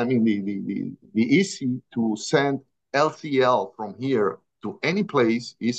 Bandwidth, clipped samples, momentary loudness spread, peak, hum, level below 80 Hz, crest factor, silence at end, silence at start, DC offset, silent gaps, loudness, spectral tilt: 9 kHz; under 0.1%; 10 LU; -6 dBFS; none; -72 dBFS; 18 dB; 0 s; 0 s; under 0.1%; none; -24 LUFS; -5.5 dB/octave